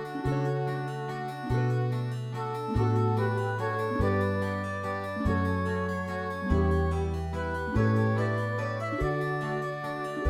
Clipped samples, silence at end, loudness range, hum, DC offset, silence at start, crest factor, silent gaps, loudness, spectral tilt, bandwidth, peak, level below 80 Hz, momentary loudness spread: under 0.1%; 0 s; 1 LU; none; under 0.1%; 0 s; 16 dB; none; -30 LUFS; -8 dB/octave; 13 kHz; -12 dBFS; -42 dBFS; 7 LU